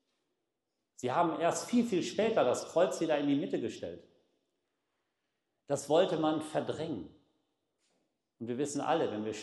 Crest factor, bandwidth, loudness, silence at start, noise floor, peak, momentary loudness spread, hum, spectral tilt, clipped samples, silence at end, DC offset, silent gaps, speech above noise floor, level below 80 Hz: 18 dB; 12.5 kHz; -32 LUFS; 1 s; -86 dBFS; -16 dBFS; 12 LU; none; -5 dB/octave; under 0.1%; 0 s; under 0.1%; none; 54 dB; -78 dBFS